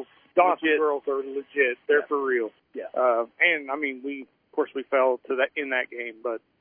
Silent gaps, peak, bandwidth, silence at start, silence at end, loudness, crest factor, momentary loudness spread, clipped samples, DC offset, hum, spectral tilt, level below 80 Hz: none; -6 dBFS; 3.6 kHz; 0 s; 0.25 s; -25 LUFS; 20 dB; 12 LU; under 0.1%; under 0.1%; none; -7 dB/octave; -82 dBFS